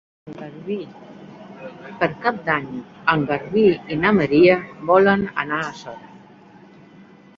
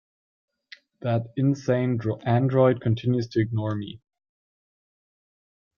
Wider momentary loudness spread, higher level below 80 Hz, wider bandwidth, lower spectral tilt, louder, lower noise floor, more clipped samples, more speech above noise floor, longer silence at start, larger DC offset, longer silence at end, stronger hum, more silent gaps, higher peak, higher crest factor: first, 23 LU vs 10 LU; first, -54 dBFS vs -62 dBFS; about the same, 7.2 kHz vs 7 kHz; about the same, -7.5 dB/octave vs -8.5 dB/octave; first, -19 LUFS vs -24 LUFS; second, -47 dBFS vs -52 dBFS; neither; about the same, 27 dB vs 29 dB; second, 0.25 s vs 1.05 s; neither; second, 1.2 s vs 1.8 s; neither; neither; first, -2 dBFS vs -6 dBFS; about the same, 20 dB vs 20 dB